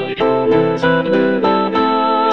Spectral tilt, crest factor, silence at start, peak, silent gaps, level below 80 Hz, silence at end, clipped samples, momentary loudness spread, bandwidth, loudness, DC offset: -7.5 dB/octave; 14 dB; 0 s; -2 dBFS; none; -50 dBFS; 0 s; under 0.1%; 1 LU; 6.8 kHz; -14 LUFS; 0.7%